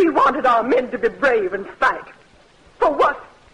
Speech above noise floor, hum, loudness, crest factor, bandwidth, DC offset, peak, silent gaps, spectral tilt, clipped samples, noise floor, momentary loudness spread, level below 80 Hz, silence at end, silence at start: 32 dB; none; -18 LUFS; 14 dB; 10.5 kHz; under 0.1%; -6 dBFS; none; -5 dB/octave; under 0.1%; -51 dBFS; 8 LU; -50 dBFS; 0.3 s; 0 s